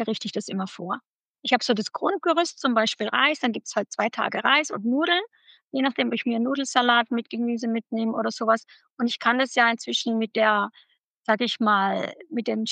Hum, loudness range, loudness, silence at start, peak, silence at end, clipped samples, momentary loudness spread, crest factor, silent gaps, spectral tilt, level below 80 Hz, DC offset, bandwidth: none; 1 LU; -24 LUFS; 0 s; -6 dBFS; 0 s; under 0.1%; 10 LU; 18 dB; 1.06-1.20 s, 1.29-1.35 s, 5.64-5.68 s, 8.90-8.97 s, 11.00-11.15 s; -3.5 dB/octave; under -90 dBFS; under 0.1%; 9.4 kHz